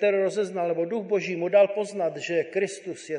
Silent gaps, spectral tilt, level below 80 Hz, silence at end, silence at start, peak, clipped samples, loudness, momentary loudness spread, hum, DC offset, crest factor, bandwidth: none; -5 dB/octave; -82 dBFS; 0 s; 0 s; -8 dBFS; under 0.1%; -26 LUFS; 8 LU; none; under 0.1%; 18 dB; 10.5 kHz